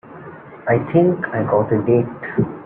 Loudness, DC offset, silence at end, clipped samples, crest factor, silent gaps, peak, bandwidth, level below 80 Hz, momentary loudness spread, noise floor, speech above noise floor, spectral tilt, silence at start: -18 LUFS; under 0.1%; 0 s; under 0.1%; 16 dB; none; -2 dBFS; 3.5 kHz; -52 dBFS; 19 LU; -37 dBFS; 20 dB; -13 dB/octave; 0.05 s